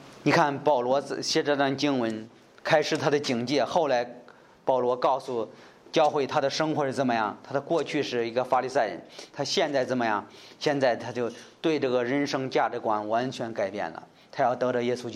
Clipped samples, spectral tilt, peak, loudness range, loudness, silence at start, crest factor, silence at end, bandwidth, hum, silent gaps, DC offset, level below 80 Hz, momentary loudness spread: under 0.1%; -4.5 dB/octave; -8 dBFS; 2 LU; -27 LUFS; 0 s; 20 dB; 0 s; 13.5 kHz; none; none; under 0.1%; -74 dBFS; 9 LU